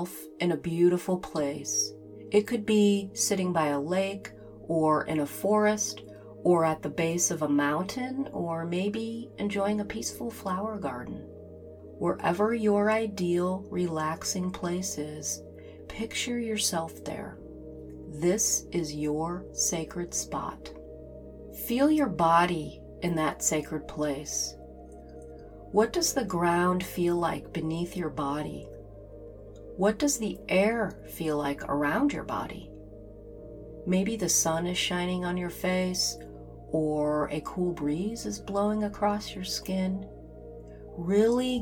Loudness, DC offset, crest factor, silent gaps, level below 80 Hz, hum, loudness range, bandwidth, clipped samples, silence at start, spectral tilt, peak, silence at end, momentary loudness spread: -29 LUFS; under 0.1%; 20 dB; none; -52 dBFS; none; 5 LU; 19 kHz; under 0.1%; 0 s; -4 dB/octave; -10 dBFS; 0 s; 21 LU